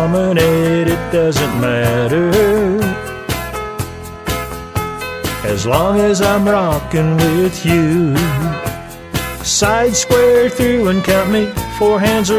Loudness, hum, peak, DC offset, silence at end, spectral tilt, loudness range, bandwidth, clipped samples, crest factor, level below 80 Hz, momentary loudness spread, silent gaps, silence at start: -14 LUFS; none; 0 dBFS; under 0.1%; 0 s; -5 dB/octave; 4 LU; 16 kHz; under 0.1%; 14 dB; -32 dBFS; 10 LU; none; 0 s